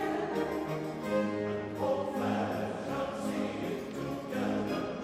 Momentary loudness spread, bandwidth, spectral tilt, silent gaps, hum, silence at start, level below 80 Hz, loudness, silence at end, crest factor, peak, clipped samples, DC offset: 4 LU; 16 kHz; -6.5 dB/octave; none; none; 0 s; -62 dBFS; -34 LUFS; 0 s; 14 dB; -18 dBFS; under 0.1%; under 0.1%